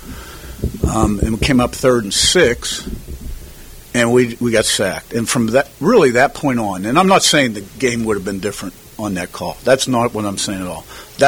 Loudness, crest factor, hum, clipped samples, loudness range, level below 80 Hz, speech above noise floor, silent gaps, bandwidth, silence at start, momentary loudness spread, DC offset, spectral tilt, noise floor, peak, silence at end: -16 LUFS; 16 dB; none; under 0.1%; 5 LU; -32 dBFS; 20 dB; none; 19.5 kHz; 0 s; 19 LU; under 0.1%; -4 dB/octave; -36 dBFS; 0 dBFS; 0 s